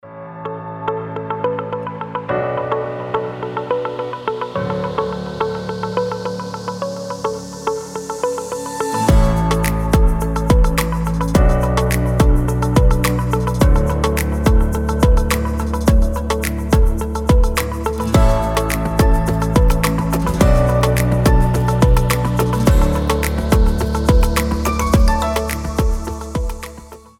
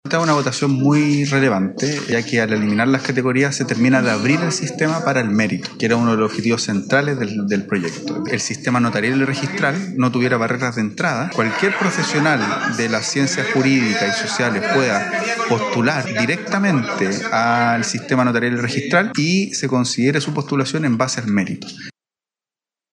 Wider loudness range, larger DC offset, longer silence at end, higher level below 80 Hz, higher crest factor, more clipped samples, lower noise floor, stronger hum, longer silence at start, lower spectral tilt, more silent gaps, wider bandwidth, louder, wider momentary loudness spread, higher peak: first, 7 LU vs 2 LU; neither; second, 0.2 s vs 1 s; first, -20 dBFS vs -68 dBFS; about the same, 14 dB vs 16 dB; neither; second, -37 dBFS vs under -90 dBFS; neither; about the same, 0.05 s vs 0.05 s; about the same, -6 dB/octave vs -5 dB/octave; neither; first, 17 kHz vs 11 kHz; about the same, -18 LUFS vs -18 LUFS; first, 10 LU vs 5 LU; about the same, -2 dBFS vs -4 dBFS